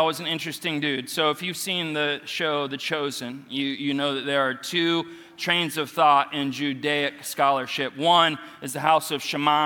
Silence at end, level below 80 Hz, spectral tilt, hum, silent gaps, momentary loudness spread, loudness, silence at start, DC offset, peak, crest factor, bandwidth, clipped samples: 0 s; -72 dBFS; -3.5 dB/octave; none; none; 9 LU; -24 LUFS; 0 s; under 0.1%; -4 dBFS; 20 dB; 18 kHz; under 0.1%